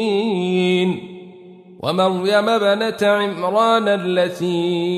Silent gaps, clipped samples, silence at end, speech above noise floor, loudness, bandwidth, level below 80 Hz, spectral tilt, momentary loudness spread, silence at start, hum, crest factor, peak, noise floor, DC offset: none; under 0.1%; 0 s; 24 dB; -18 LUFS; 13.5 kHz; -66 dBFS; -6 dB/octave; 7 LU; 0 s; none; 16 dB; -4 dBFS; -41 dBFS; under 0.1%